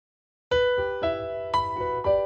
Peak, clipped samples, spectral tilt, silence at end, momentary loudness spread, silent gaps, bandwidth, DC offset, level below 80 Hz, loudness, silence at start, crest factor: -12 dBFS; under 0.1%; -5.5 dB/octave; 0 s; 5 LU; none; 9 kHz; under 0.1%; -48 dBFS; -26 LUFS; 0.5 s; 14 dB